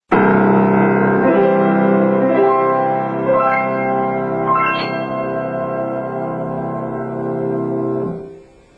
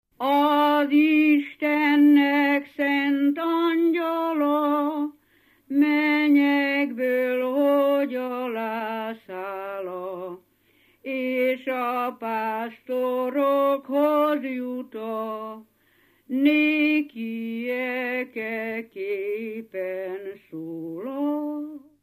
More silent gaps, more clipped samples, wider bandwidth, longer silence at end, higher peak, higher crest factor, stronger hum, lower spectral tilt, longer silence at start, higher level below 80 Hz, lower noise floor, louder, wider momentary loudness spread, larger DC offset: neither; neither; second, 5.2 kHz vs 15 kHz; first, 0.4 s vs 0.25 s; first, -2 dBFS vs -8 dBFS; about the same, 14 dB vs 16 dB; neither; first, -9.5 dB/octave vs -5.5 dB/octave; about the same, 0.1 s vs 0.2 s; first, -52 dBFS vs -80 dBFS; second, -39 dBFS vs -62 dBFS; first, -16 LUFS vs -24 LUFS; second, 10 LU vs 14 LU; neither